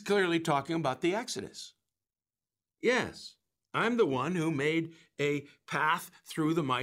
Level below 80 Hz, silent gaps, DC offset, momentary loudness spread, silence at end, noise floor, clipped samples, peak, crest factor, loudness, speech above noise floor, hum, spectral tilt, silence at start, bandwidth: -72 dBFS; none; under 0.1%; 14 LU; 0 s; under -90 dBFS; under 0.1%; -14 dBFS; 18 dB; -31 LUFS; over 59 dB; none; -5 dB/octave; 0 s; 16 kHz